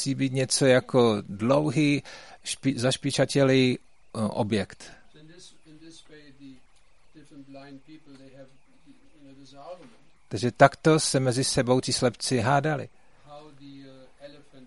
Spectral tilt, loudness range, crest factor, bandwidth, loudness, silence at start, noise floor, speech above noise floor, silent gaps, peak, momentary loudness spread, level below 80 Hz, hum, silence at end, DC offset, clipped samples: -5 dB/octave; 11 LU; 26 dB; 11.5 kHz; -24 LUFS; 0 s; -61 dBFS; 36 dB; none; 0 dBFS; 24 LU; -58 dBFS; none; 0.4 s; 0.2%; under 0.1%